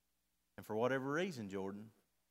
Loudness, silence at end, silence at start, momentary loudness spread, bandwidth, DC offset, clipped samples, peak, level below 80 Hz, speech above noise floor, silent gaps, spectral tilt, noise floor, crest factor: -41 LUFS; 0.4 s; 0.6 s; 21 LU; 16 kHz; under 0.1%; under 0.1%; -22 dBFS; -86 dBFS; 44 dB; none; -6 dB/octave; -85 dBFS; 20 dB